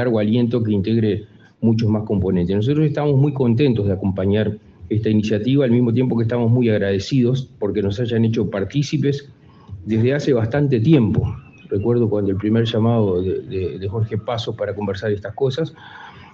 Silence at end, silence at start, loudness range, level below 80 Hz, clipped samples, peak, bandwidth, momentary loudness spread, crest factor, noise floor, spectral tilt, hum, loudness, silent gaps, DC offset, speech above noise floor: 0.05 s; 0 s; 3 LU; -50 dBFS; under 0.1%; -2 dBFS; 7.2 kHz; 8 LU; 16 dB; -38 dBFS; -8 dB/octave; none; -19 LUFS; none; under 0.1%; 20 dB